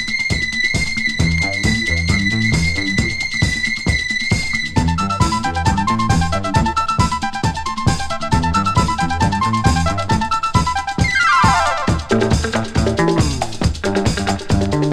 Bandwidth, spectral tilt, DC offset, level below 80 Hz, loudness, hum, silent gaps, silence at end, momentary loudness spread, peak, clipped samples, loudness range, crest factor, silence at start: 14 kHz; -4.5 dB/octave; under 0.1%; -28 dBFS; -17 LUFS; none; none; 0 s; 3 LU; 0 dBFS; under 0.1%; 2 LU; 16 dB; 0 s